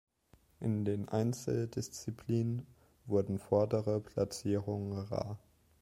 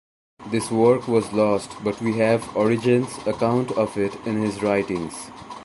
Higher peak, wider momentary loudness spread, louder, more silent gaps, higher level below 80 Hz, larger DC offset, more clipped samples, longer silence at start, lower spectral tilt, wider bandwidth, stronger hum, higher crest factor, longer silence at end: second, -16 dBFS vs -4 dBFS; about the same, 10 LU vs 9 LU; second, -36 LUFS vs -22 LUFS; neither; second, -64 dBFS vs -56 dBFS; neither; neither; first, 0.6 s vs 0.4 s; about the same, -7 dB/octave vs -6 dB/octave; first, 15.5 kHz vs 11.5 kHz; neither; about the same, 20 dB vs 18 dB; first, 0.45 s vs 0 s